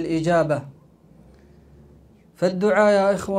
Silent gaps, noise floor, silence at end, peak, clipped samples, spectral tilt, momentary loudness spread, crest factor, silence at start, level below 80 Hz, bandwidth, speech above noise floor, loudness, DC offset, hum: none; -51 dBFS; 0 s; -6 dBFS; under 0.1%; -6.5 dB/octave; 8 LU; 18 dB; 0 s; -54 dBFS; 13.5 kHz; 32 dB; -20 LUFS; under 0.1%; none